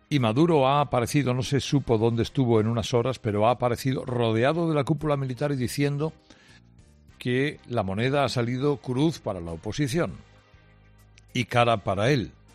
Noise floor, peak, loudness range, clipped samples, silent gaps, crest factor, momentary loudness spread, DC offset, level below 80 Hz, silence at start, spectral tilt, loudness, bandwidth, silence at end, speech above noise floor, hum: -55 dBFS; -8 dBFS; 5 LU; under 0.1%; none; 18 dB; 8 LU; under 0.1%; -52 dBFS; 0.1 s; -6.5 dB/octave; -25 LUFS; 14 kHz; 0.25 s; 31 dB; none